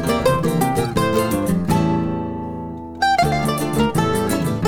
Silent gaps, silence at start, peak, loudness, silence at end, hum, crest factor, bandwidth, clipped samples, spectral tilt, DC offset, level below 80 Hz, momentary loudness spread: none; 0 s; -4 dBFS; -19 LUFS; 0 s; none; 16 dB; 18.5 kHz; under 0.1%; -6 dB/octave; under 0.1%; -38 dBFS; 9 LU